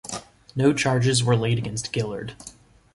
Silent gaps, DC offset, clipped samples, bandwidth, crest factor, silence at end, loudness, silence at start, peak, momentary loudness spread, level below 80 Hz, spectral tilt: none; under 0.1%; under 0.1%; 11.5 kHz; 18 dB; 0.45 s; -23 LUFS; 0.05 s; -6 dBFS; 17 LU; -52 dBFS; -5 dB/octave